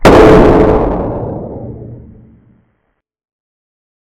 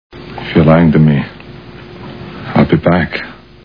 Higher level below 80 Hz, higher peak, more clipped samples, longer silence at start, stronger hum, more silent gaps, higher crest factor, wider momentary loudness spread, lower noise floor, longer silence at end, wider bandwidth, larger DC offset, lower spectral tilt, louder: first, -22 dBFS vs -34 dBFS; about the same, 0 dBFS vs 0 dBFS; first, 3% vs 0.2%; second, 0 s vs 0.15 s; neither; neither; about the same, 10 dB vs 12 dB; about the same, 23 LU vs 24 LU; first, -64 dBFS vs -32 dBFS; first, 2 s vs 0.3 s; first, 16 kHz vs 5.2 kHz; second, under 0.1% vs 0.5%; second, -7 dB/octave vs -10 dB/octave; first, -8 LUFS vs -11 LUFS